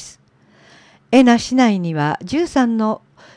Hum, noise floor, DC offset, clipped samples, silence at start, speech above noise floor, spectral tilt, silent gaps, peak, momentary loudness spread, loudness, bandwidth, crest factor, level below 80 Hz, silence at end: none; -52 dBFS; under 0.1%; under 0.1%; 0 s; 37 dB; -5.5 dB/octave; none; -2 dBFS; 9 LU; -16 LUFS; 10.5 kHz; 16 dB; -52 dBFS; 0.4 s